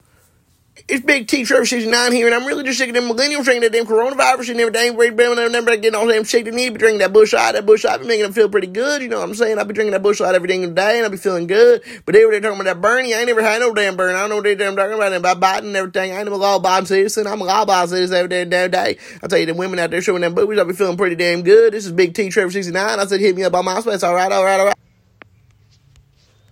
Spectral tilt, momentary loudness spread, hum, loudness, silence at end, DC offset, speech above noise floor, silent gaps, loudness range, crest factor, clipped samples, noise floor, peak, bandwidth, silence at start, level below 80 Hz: -3.5 dB/octave; 7 LU; none; -15 LUFS; 1.75 s; under 0.1%; 41 dB; none; 3 LU; 16 dB; under 0.1%; -56 dBFS; 0 dBFS; 16.5 kHz; 0.9 s; -60 dBFS